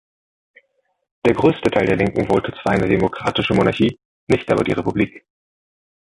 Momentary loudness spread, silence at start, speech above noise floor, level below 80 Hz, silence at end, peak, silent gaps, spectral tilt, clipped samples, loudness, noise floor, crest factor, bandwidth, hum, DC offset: 5 LU; 1.25 s; 44 dB; -44 dBFS; 0.85 s; -2 dBFS; 4.05-4.27 s; -7 dB/octave; under 0.1%; -18 LUFS; -62 dBFS; 18 dB; 11.5 kHz; none; under 0.1%